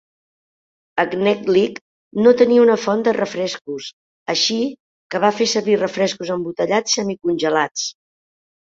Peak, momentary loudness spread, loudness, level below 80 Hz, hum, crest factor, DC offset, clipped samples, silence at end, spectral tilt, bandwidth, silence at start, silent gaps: -2 dBFS; 14 LU; -18 LUFS; -64 dBFS; none; 18 dB; under 0.1%; under 0.1%; 0.7 s; -3.5 dB/octave; 7.8 kHz; 0.95 s; 1.81-2.11 s, 3.61-3.65 s, 3.93-4.26 s, 4.80-5.10 s, 7.71-7.75 s